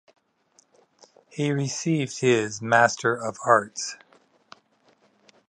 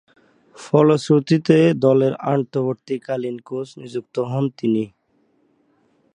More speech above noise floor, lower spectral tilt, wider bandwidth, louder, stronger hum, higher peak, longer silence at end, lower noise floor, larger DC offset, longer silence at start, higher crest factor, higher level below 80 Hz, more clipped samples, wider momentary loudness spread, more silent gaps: second, 40 dB vs 44 dB; second, -4.5 dB/octave vs -7.5 dB/octave; about the same, 11.5 kHz vs 10.5 kHz; second, -23 LUFS vs -19 LUFS; neither; about the same, -4 dBFS vs -2 dBFS; first, 1.55 s vs 1.3 s; about the same, -64 dBFS vs -63 dBFS; neither; first, 1.35 s vs 0.6 s; about the same, 24 dB vs 20 dB; about the same, -70 dBFS vs -66 dBFS; neither; about the same, 13 LU vs 14 LU; neither